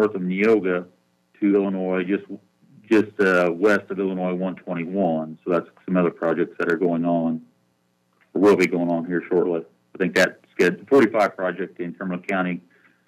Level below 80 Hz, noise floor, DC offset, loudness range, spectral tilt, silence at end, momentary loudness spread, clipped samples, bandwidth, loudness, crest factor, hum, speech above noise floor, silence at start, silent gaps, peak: -70 dBFS; -67 dBFS; under 0.1%; 3 LU; -6.5 dB/octave; 0.5 s; 11 LU; under 0.1%; 14.5 kHz; -22 LUFS; 18 dB; none; 46 dB; 0 s; none; -4 dBFS